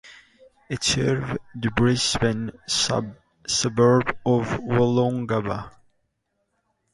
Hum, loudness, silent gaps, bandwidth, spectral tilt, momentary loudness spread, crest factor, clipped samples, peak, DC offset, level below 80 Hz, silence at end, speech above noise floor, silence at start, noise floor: none; -23 LUFS; none; 11.5 kHz; -4.5 dB/octave; 12 LU; 18 dB; under 0.1%; -6 dBFS; under 0.1%; -48 dBFS; 1.25 s; 52 dB; 0.05 s; -74 dBFS